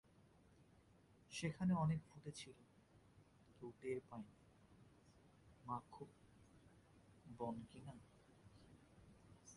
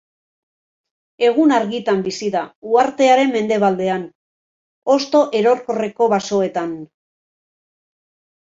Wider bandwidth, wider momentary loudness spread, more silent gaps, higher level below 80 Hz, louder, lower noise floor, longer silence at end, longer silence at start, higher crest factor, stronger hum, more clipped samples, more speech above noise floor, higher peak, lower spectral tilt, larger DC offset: first, 11.5 kHz vs 7.8 kHz; first, 27 LU vs 11 LU; second, none vs 2.55-2.62 s, 4.15-4.82 s; second, -74 dBFS vs -64 dBFS; second, -48 LUFS vs -17 LUFS; second, -71 dBFS vs under -90 dBFS; second, 0 s vs 1.65 s; second, 0.6 s vs 1.2 s; about the same, 20 dB vs 16 dB; neither; neither; second, 25 dB vs over 74 dB; second, -32 dBFS vs -2 dBFS; first, -6.5 dB/octave vs -5 dB/octave; neither